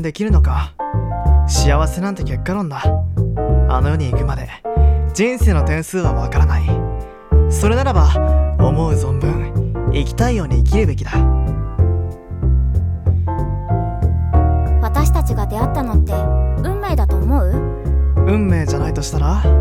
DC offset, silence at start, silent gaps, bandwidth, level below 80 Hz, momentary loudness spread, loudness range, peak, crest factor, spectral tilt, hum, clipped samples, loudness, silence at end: under 0.1%; 0 s; none; 13.5 kHz; -18 dBFS; 6 LU; 2 LU; -2 dBFS; 12 dB; -7 dB/octave; none; under 0.1%; -17 LUFS; 0 s